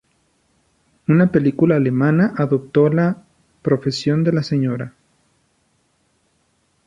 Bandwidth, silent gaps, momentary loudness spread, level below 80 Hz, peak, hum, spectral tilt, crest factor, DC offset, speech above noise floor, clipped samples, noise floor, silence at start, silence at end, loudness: 7.8 kHz; none; 12 LU; -56 dBFS; -2 dBFS; none; -8 dB/octave; 16 dB; under 0.1%; 48 dB; under 0.1%; -64 dBFS; 1.1 s; 2 s; -18 LUFS